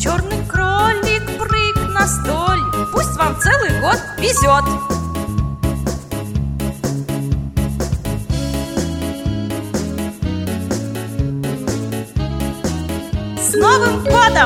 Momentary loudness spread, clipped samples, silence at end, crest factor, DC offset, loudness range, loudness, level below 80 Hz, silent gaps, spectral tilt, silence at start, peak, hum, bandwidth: 9 LU; under 0.1%; 0 s; 18 dB; under 0.1%; 6 LU; -18 LUFS; -28 dBFS; none; -4.5 dB/octave; 0 s; 0 dBFS; none; 17 kHz